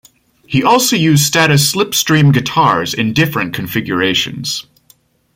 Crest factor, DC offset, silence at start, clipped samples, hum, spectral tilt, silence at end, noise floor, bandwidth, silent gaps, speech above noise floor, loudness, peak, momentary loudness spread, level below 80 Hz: 14 dB; under 0.1%; 0.5 s; under 0.1%; none; -4 dB/octave; 0.75 s; -52 dBFS; 16.5 kHz; none; 39 dB; -13 LUFS; 0 dBFS; 8 LU; -48 dBFS